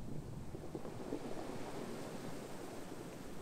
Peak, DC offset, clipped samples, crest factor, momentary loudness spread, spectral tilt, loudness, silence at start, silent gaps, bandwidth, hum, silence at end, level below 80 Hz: -28 dBFS; under 0.1%; under 0.1%; 16 dB; 4 LU; -5.5 dB/octave; -48 LUFS; 0 s; none; 16 kHz; none; 0 s; -58 dBFS